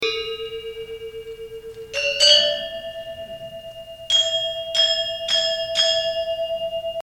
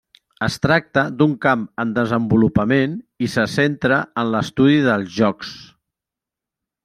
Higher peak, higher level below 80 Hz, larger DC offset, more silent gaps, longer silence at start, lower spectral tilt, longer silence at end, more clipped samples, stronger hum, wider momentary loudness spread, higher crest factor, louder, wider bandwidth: about the same, 0 dBFS vs -2 dBFS; about the same, -54 dBFS vs -50 dBFS; neither; neither; second, 0 s vs 0.4 s; second, 0.5 dB/octave vs -6.5 dB/octave; second, 0.1 s vs 1.2 s; neither; neither; first, 20 LU vs 8 LU; about the same, 22 dB vs 18 dB; about the same, -19 LUFS vs -18 LUFS; first, 18 kHz vs 14 kHz